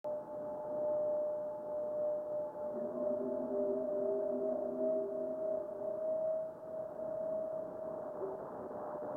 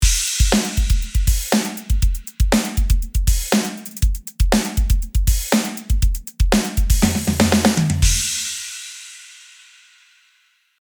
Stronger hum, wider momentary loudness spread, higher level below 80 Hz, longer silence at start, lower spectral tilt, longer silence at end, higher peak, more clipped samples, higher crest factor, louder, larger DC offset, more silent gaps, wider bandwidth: neither; about the same, 7 LU vs 7 LU; second, -78 dBFS vs -20 dBFS; about the same, 0.05 s vs 0 s; first, -9.5 dB/octave vs -4 dB/octave; second, 0 s vs 1.5 s; second, -24 dBFS vs 0 dBFS; neither; about the same, 14 dB vs 18 dB; second, -39 LUFS vs -19 LUFS; neither; neither; second, 2.1 kHz vs over 20 kHz